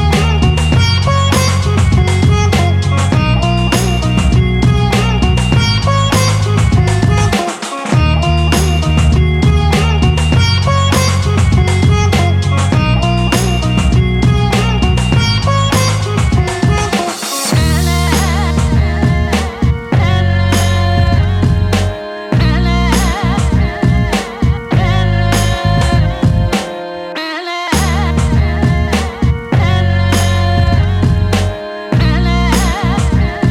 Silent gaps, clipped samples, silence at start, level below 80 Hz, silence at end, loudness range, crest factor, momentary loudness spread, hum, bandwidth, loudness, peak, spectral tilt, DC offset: none; under 0.1%; 0 s; -18 dBFS; 0 s; 2 LU; 10 dB; 4 LU; none; 16 kHz; -12 LUFS; 0 dBFS; -5.5 dB/octave; under 0.1%